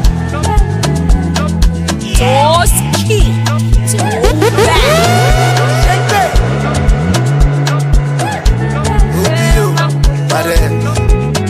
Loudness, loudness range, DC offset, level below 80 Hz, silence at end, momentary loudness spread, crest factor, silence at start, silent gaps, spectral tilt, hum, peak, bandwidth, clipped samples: -11 LUFS; 2 LU; under 0.1%; -14 dBFS; 0 s; 5 LU; 10 dB; 0 s; none; -5 dB/octave; none; 0 dBFS; 15.5 kHz; under 0.1%